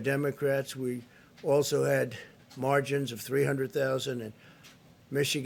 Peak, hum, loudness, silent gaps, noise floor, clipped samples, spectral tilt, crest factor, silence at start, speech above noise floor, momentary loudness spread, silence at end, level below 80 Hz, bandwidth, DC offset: -12 dBFS; none; -30 LUFS; none; -56 dBFS; under 0.1%; -5 dB/octave; 18 dB; 0 s; 26 dB; 11 LU; 0 s; -72 dBFS; 17.5 kHz; under 0.1%